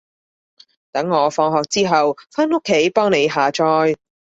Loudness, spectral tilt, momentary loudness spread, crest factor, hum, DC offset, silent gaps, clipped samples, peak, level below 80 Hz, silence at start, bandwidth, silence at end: -17 LUFS; -4.5 dB/octave; 5 LU; 16 dB; none; under 0.1%; none; under 0.1%; -2 dBFS; -62 dBFS; 0.95 s; 8 kHz; 0.4 s